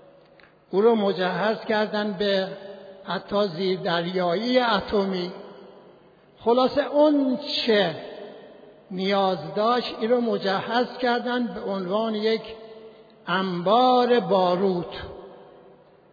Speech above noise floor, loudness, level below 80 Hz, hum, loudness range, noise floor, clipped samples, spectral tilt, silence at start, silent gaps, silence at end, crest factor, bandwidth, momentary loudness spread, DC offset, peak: 31 dB; -23 LUFS; -60 dBFS; none; 2 LU; -54 dBFS; under 0.1%; -7 dB/octave; 0.75 s; none; 0.7 s; 16 dB; 5 kHz; 18 LU; under 0.1%; -8 dBFS